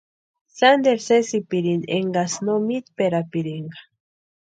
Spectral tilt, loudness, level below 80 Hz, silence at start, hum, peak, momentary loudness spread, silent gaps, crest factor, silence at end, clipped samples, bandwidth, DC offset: -5 dB/octave; -21 LUFS; -70 dBFS; 0.55 s; none; 0 dBFS; 11 LU; none; 22 dB; 0.7 s; under 0.1%; 9.4 kHz; under 0.1%